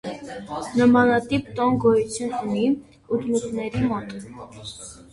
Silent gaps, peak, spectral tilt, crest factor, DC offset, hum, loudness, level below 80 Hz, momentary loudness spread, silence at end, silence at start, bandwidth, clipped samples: none; -6 dBFS; -6 dB/octave; 18 dB; under 0.1%; none; -22 LUFS; -52 dBFS; 19 LU; 0.15 s; 0.05 s; 11.5 kHz; under 0.1%